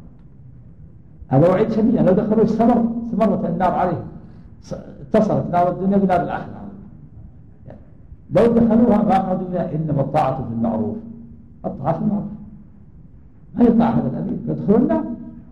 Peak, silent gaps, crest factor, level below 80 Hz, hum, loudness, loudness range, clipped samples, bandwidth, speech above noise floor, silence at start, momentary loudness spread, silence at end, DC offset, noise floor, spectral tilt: -4 dBFS; none; 16 dB; -44 dBFS; none; -18 LUFS; 5 LU; under 0.1%; 6.6 kHz; 28 dB; 0 s; 18 LU; 0.1 s; 0.5%; -45 dBFS; -10 dB/octave